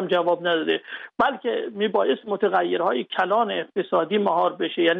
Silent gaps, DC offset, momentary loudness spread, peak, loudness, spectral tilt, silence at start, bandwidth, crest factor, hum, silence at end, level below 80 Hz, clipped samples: none; under 0.1%; 5 LU; -8 dBFS; -23 LUFS; -7 dB/octave; 0 s; 5.8 kHz; 14 dB; none; 0 s; -68 dBFS; under 0.1%